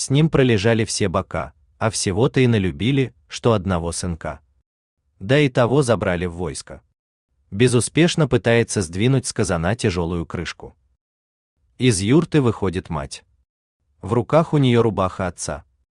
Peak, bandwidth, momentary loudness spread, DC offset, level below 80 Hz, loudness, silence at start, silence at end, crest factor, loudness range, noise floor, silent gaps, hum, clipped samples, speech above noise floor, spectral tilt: -2 dBFS; 12.5 kHz; 13 LU; under 0.1%; -46 dBFS; -20 LUFS; 0 s; 0.35 s; 18 dB; 3 LU; under -90 dBFS; 4.66-4.97 s, 6.99-7.29 s, 11.01-11.57 s, 13.49-13.80 s; none; under 0.1%; over 71 dB; -5.5 dB/octave